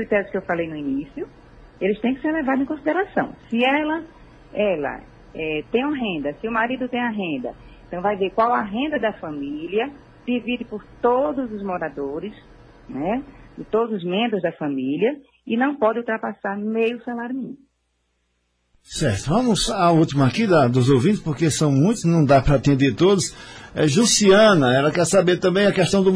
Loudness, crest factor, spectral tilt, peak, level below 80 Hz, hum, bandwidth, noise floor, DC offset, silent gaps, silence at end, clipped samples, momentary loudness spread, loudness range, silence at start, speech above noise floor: -21 LUFS; 16 dB; -5 dB/octave; -4 dBFS; -44 dBFS; none; 10.5 kHz; -70 dBFS; under 0.1%; none; 0 s; under 0.1%; 13 LU; 9 LU; 0 s; 50 dB